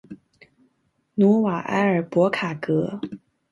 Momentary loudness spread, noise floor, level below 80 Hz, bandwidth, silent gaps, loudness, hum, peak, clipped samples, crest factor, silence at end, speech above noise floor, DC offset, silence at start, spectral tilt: 15 LU; -69 dBFS; -66 dBFS; 11 kHz; none; -22 LUFS; none; -6 dBFS; under 0.1%; 18 dB; 0.35 s; 48 dB; under 0.1%; 0.1 s; -8 dB/octave